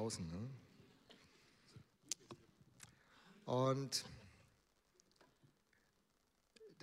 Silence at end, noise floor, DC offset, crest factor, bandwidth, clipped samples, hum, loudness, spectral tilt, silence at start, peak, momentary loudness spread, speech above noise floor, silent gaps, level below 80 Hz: 0.1 s; -81 dBFS; under 0.1%; 28 dB; 15.5 kHz; under 0.1%; none; -43 LUFS; -4.5 dB/octave; 0 s; -22 dBFS; 27 LU; 39 dB; none; -76 dBFS